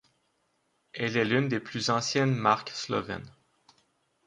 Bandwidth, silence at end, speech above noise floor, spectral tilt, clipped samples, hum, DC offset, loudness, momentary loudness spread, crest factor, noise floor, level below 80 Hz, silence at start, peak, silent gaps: 10.5 kHz; 0.95 s; 46 dB; -5 dB/octave; under 0.1%; none; under 0.1%; -28 LUFS; 11 LU; 22 dB; -74 dBFS; -66 dBFS; 0.95 s; -8 dBFS; none